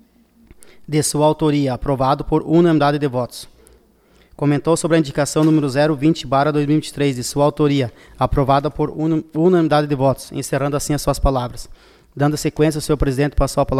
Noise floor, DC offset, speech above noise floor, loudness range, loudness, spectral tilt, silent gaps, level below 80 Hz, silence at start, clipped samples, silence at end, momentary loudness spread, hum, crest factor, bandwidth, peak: -53 dBFS; under 0.1%; 36 dB; 2 LU; -18 LUFS; -6 dB/octave; none; -32 dBFS; 0.6 s; under 0.1%; 0 s; 7 LU; none; 16 dB; 15 kHz; -2 dBFS